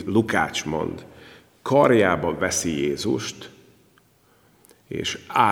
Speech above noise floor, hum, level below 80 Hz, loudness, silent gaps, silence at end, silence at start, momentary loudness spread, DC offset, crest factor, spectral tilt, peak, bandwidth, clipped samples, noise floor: 37 dB; none; -54 dBFS; -22 LUFS; none; 0 s; 0 s; 17 LU; under 0.1%; 20 dB; -4.5 dB/octave; -4 dBFS; 19.5 kHz; under 0.1%; -59 dBFS